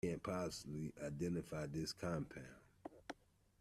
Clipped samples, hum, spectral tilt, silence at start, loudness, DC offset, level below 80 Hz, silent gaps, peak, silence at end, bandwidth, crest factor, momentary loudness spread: under 0.1%; none; -5.5 dB/octave; 0.05 s; -46 LUFS; under 0.1%; -68 dBFS; none; -28 dBFS; 0.45 s; 14.5 kHz; 18 dB; 15 LU